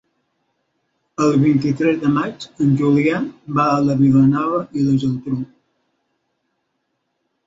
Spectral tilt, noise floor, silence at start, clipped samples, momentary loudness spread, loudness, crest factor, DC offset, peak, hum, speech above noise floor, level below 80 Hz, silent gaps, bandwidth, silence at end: -8 dB/octave; -72 dBFS; 1.2 s; under 0.1%; 11 LU; -17 LUFS; 14 dB; under 0.1%; -4 dBFS; none; 55 dB; -54 dBFS; none; 7.8 kHz; 2 s